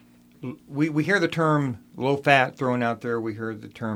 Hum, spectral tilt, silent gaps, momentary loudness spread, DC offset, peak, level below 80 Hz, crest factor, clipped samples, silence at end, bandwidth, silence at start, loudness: none; -6.5 dB/octave; none; 14 LU; under 0.1%; -2 dBFS; -66 dBFS; 22 dB; under 0.1%; 0 s; 16 kHz; 0.4 s; -24 LUFS